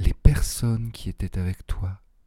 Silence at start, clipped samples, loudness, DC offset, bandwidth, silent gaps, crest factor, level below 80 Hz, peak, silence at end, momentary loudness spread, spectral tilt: 0 s; under 0.1%; -27 LUFS; under 0.1%; 16 kHz; none; 22 dB; -26 dBFS; 0 dBFS; 0.3 s; 11 LU; -6 dB/octave